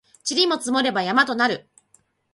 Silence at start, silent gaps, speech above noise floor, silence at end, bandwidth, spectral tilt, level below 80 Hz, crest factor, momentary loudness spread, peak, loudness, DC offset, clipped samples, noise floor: 0.25 s; none; 41 dB; 0.75 s; 11.5 kHz; -2.5 dB/octave; -70 dBFS; 20 dB; 5 LU; -4 dBFS; -20 LUFS; under 0.1%; under 0.1%; -62 dBFS